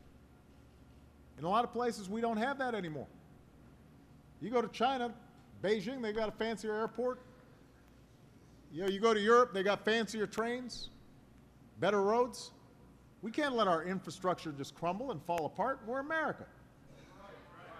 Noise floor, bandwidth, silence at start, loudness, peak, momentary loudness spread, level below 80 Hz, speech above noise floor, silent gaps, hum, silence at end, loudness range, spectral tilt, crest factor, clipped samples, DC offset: -61 dBFS; 13.5 kHz; 0.05 s; -35 LUFS; -16 dBFS; 17 LU; -64 dBFS; 26 dB; none; none; 0 s; 6 LU; -5 dB/octave; 20 dB; under 0.1%; under 0.1%